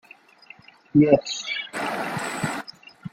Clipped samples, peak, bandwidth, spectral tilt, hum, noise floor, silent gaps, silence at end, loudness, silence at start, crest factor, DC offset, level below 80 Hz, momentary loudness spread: under 0.1%; -2 dBFS; 15 kHz; -5 dB/octave; none; -50 dBFS; none; 0.05 s; -23 LUFS; 0.95 s; 22 dB; under 0.1%; -60 dBFS; 16 LU